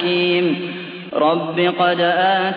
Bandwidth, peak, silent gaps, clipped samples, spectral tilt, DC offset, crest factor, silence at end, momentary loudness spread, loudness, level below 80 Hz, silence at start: 5 kHz; -4 dBFS; none; under 0.1%; -8 dB/octave; under 0.1%; 14 dB; 0 s; 10 LU; -18 LUFS; -72 dBFS; 0 s